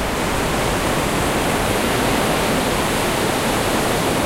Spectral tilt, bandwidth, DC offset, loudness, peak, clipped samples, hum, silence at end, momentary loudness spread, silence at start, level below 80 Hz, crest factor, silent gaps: -4 dB/octave; 16 kHz; under 0.1%; -18 LUFS; -6 dBFS; under 0.1%; none; 0 s; 1 LU; 0 s; -32 dBFS; 12 dB; none